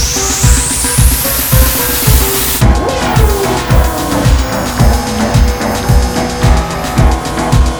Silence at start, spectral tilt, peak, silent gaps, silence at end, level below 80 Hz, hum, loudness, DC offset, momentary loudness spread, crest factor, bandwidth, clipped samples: 0 s; -4 dB/octave; 0 dBFS; none; 0 s; -14 dBFS; none; -11 LUFS; 0.3%; 4 LU; 10 dB; over 20 kHz; 1%